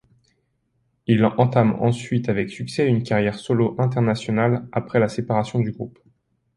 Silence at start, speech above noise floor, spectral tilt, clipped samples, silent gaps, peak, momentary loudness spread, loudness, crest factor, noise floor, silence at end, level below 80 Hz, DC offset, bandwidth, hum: 1.1 s; 49 dB; -7.5 dB/octave; under 0.1%; none; -2 dBFS; 7 LU; -21 LUFS; 20 dB; -69 dBFS; 0.65 s; -54 dBFS; under 0.1%; 11 kHz; none